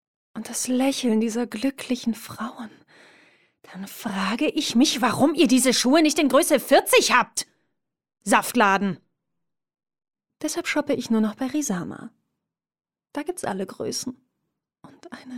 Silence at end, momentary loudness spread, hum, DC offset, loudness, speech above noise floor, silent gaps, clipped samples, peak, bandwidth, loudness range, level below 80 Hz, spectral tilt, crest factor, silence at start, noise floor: 0 s; 18 LU; none; under 0.1%; -22 LUFS; 62 dB; none; under 0.1%; -4 dBFS; 17 kHz; 11 LU; -66 dBFS; -3 dB/octave; 20 dB; 0.35 s; -84 dBFS